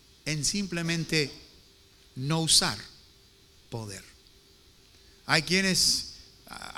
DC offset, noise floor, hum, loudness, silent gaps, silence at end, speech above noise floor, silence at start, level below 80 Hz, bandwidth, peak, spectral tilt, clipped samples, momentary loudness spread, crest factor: under 0.1%; -58 dBFS; none; -25 LUFS; none; 0 s; 30 dB; 0.25 s; -54 dBFS; 18 kHz; -6 dBFS; -2.5 dB/octave; under 0.1%; 23 LU; 26 dB